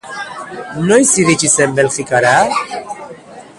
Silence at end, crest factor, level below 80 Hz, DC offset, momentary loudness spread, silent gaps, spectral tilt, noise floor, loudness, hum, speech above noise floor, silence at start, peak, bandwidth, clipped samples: 0.15 s; 14 dB; -52 dBFS; under 0.1%; 17 LU; none; -3.5 dB/octave; -35 dBFS; -12 LUFS; none; 22 dB; 0.05 s; 0 dBFS; 11.5 kHz; under 0.1%